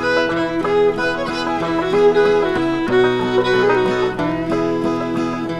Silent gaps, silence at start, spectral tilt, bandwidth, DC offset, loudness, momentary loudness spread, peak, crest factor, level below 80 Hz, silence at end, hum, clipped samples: none; 0 s; -6 dB/octave; 11 kHz; under 0.1%; -17 LUFS; 6 LU; -4 dBFS; 14 dB; -44 dBFS; 0 s; none; under 0.1%